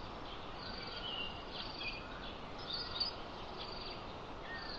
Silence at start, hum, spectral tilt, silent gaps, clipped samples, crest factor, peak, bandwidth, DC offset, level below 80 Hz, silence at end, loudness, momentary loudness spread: 0 s; none; -4.5 dB/octave; none; under 0.1%; 18 dB; -26 dBFS; 8 kHz; under 0.1%; -54 dBFS; 0 s; -43 LUFS; 8 LU